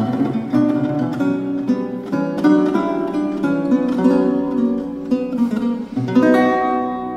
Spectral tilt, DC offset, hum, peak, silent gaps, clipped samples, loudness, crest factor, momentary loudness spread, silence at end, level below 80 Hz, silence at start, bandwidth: -8 dB/octave; under 0.1%; none; -4 dBFS; none; under 0.1%; -18 LUFS; 14 dB; 7 LU; 0 s; -52 dBFS; 0 s; 9 kHz